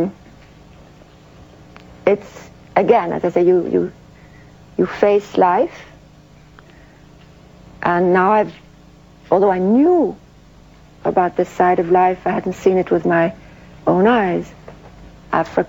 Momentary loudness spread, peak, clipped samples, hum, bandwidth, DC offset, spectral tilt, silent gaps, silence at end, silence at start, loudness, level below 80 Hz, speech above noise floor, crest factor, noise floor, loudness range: 9 LU; 0 dBFS; under 0.1%; 50 Hz at -50 dBFS; 7.8 kHz; under 0.1%; -7.5 dB/octave; none; 0 s; 0 s; -17 LUFS; -50 dBFS; 29 dB; 18 dB; -45 dBFS; 4 LU